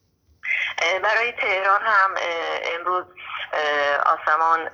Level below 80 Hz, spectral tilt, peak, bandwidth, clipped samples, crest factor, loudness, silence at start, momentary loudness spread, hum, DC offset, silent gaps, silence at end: -68 dBFS; -1.5 dB/octave; -6 dBFS; 7.6 kHz; under 0.1%; 16 dB; -21 LUFS; 0.45 s; 8 LU; none; under 0.1%; none; 0 s